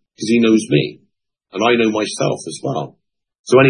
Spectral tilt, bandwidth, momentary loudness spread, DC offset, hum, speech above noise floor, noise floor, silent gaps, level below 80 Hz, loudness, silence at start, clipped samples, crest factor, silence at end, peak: -5.5 dB/octave; 11 kHz; 14 LU; under 0.1%; none; 45 dB; -62 dBFS; 3.39-3.44 s; -62 dBFS; -17 LUFS; 0.2 s; under 0.1%; 16 dB; 0 s; 0 dBFS